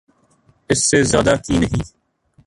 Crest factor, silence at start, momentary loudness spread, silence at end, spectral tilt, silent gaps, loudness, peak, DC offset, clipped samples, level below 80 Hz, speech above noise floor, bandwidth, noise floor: 18 dB; 0.7 s; 10 LU; 0.6 s; -4 dB/octave; none; -17 LUFS; 0 dBFS; under 0.1%; under 0.1%; -36 dBFS; 41 dB; 11.5 kHz; -57 dBFS